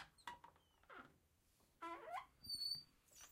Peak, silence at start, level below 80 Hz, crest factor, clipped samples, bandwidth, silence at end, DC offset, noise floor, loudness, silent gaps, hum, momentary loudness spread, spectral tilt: -36 dBFS; 0 s; -80 dBFS; 20 dB; under 0.1%; 16 kHz; 0 s; under 0.1%; -78 dBFS; -49 LUFS; none; none; 20 LU; -1.5 dB/octave